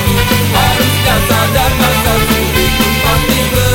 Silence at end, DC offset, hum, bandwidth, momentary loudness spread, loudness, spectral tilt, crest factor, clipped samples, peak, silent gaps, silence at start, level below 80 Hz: 0 s; under 0.1%; none; 17 kHz; 1 LU; -10 LUFS; -4 dB/octave; 10 dB; under 0.1%; 0 dBFS; none; 0 s; -20 dBFS